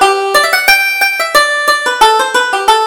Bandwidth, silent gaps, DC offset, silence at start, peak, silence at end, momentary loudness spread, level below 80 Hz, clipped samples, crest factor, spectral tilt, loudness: over 20 kHz; none; under 0.1%; 0 s; 0 dBFS; 0 s; 4 LU; -44 dBFS; 0.3%; 10 dB; 0.5 dB/octave; -9 LUFS